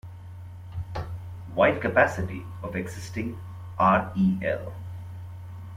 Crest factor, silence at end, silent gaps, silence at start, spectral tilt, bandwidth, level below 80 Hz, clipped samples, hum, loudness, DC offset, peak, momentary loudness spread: 20 dB; 0 s; none; 0.05 s; -7 dB/octave; 14 kHz; -50 dBFS; under 0.1%; none; -26 LUFS; under 0.1%; -6 dBFS; 19 LU